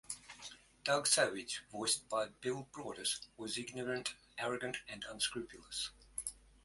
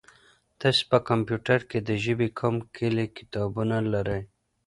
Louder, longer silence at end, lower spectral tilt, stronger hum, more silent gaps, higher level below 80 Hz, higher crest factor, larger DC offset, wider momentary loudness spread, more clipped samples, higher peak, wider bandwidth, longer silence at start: second, -38 LUFS vs -27 LUFS; second, 0.25 s vs 0.4 s; second, -1.5 dB/octave vs -6.5 dB/octave; neither; neither; second, -70 dBFS vs -54 dBFS; about the same, 24 dB vs 22 dB; neither; first, 14 LU vs 7 LU; neither; second, -16 dBFS vs -6 dBFS; about the same, 12 kHz vs 11.5 kHz; second, 0.1 s vs 0.6 s